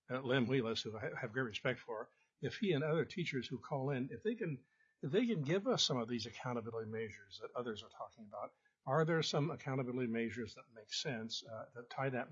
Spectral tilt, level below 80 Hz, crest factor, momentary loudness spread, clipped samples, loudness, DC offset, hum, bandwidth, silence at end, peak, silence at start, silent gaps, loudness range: -4.5 dB/octave; -82 dBFS; 20 dB; 15 LU; under 0.1%; -40 LUFS; under 0.1%; none; 7.4 kHz; 0 s; -20 dBFS; 0.1 s; none; 2 LU